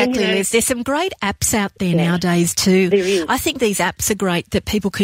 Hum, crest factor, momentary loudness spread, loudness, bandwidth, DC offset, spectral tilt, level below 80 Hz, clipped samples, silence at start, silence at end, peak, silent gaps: none; 14 dB; 5 LU; -17 LUFS; 16.5 kHz; under 0.1%; -4 dB/octave; -42 dBFS; under 0.1%; 0 s; 0 s; -4 dBFS; none